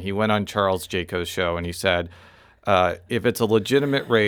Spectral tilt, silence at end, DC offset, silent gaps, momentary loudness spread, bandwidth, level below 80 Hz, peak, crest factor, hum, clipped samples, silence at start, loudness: -5 dB/octave; 0 s; under 0.1%; none; 6 LU; over 20 kHz; -50 dBFS; -4 dBFS; 18 dB; none; under 0.1%; 0 s; -22 LUFS